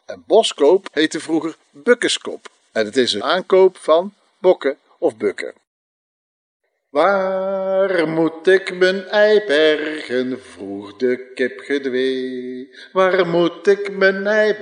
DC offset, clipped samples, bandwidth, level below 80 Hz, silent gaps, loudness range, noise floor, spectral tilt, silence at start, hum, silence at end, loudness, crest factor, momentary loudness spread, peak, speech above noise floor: under 0.1%; under 0.1%; 10 kHz; -80 dBFS; 5.67-6.60 s; 5 LU; under -90 dBFS; -4 dB/octave; 0.1 s; none; 0 s; -18 LUFS; 16 dB; 13 LU; -2 dBFS; over 73 dB